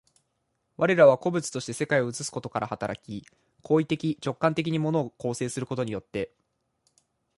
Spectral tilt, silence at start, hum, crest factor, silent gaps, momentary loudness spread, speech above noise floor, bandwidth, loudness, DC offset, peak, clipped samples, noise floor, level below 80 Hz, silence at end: -5.5 dB/octave; 0.8 s; none; 22 dB; none; 15 LU; 50 dB; 11.5 kHz; -26 LUFS; under 0.1%; -6 dBFS; under 0.1%; -76 dBFS; -64 dBFS; 1.1 s